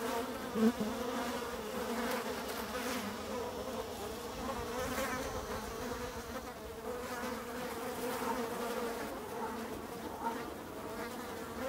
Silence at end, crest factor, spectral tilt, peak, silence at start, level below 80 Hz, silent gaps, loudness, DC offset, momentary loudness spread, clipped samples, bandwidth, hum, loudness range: 0 s; 20 dB; -4 dB/octave; -18 dBFS; 0 s; -58 dBFS; none; -39 LUFS; under 0.1%; 6 LU; under 0.1%; 16 kHz; none; 3 LU